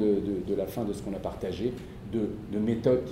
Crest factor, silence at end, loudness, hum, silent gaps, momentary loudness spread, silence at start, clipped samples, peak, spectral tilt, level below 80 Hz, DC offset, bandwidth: 18 dB; 0 s; -31 LUFS; none; none; 8 LU; 0 s; under 0.1%; -10 dBFS; -8 dB/octave; -50 dBFS; under 0.1%; 16 kHz